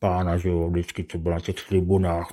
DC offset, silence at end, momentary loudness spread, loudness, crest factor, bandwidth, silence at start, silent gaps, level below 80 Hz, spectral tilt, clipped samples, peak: under 0.1%; 0 s; 7 LU; -25 LUFS; 16 dB; 15 kHz; 0 s; none; -44 dBFS; -7.5 dB/octave; under 0.1%; -8 dBFS